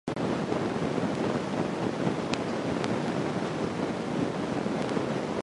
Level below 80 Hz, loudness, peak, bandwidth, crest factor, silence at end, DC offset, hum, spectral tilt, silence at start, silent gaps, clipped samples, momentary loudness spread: -56 dBFS; -30 LUFS; -10 dBFS; 11.5 kHz; 20 dB; 0 s; under 0.1%; none; -6 dB/octave; 0.05 s; none; under 0.1%; 2 LU